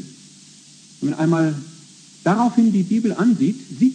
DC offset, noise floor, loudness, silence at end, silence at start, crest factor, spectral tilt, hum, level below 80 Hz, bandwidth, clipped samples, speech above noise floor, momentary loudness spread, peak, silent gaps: under 0.1%; -46 dBFS; -19 LUFS; 0 s; 0 s; 14 dB; -7 dB/octave; none; -72 dBFS; 9.8 kHz; under 0.1%; 28 dB; 12 LU; -6 dBFS; none